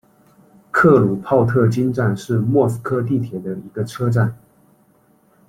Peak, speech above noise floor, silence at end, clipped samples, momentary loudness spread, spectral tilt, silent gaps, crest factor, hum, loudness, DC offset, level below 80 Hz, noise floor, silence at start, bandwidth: -2 dBFS; 39 dB; 1.15 s; under 0.1%; 13 LU; -8.5 dB/octave; none; 18 dB; none; -18 LUFS; under 0.1%; -54 dBFS; -56 dBFS; 0.75 s; 13.5 kHz